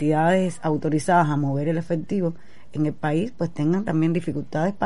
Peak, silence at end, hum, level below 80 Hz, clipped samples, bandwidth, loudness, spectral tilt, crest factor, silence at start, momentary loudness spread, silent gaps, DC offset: -6 dBFS; 0 s; none; -56 dBFS; under 0.1%; 11.5 kHz; -23 LUFS; -7.5 dB/octave; 16 dB; 0 s; 7 LU; none; 2%